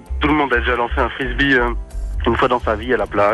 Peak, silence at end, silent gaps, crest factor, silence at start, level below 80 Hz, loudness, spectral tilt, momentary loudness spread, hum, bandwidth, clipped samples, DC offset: -4 dBFS; 0 s; none; 12 dB; 0 s; -26 dBFS; -17 LUFS; -6.5 dB/octave; 7 LU; none; 12 kHz; under 0.1%; under 0.1%